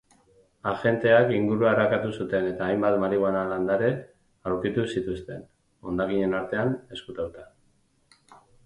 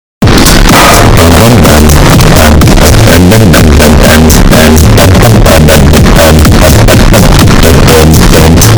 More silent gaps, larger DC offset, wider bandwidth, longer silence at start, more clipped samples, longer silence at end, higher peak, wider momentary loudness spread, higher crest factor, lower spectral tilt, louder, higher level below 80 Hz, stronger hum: neither; second, under 0.1% vs 7%; second, 10.5 kHz vs over 20 kHz; first, 0.65 s vs 0.2 s; second, under 0.1% vs 70%; first, 0.3 s vs 0 s; second, -8 dBFS vs 0 dBFS; first, 15 LU vs 1 LU; first, 20 dB vs 2 dB; first, -7.5 dB/octave vs -5 dB/octave; second, -25 LUFS vs -2 LUFS; second, -56 dBFS vs -8 dBFS; neither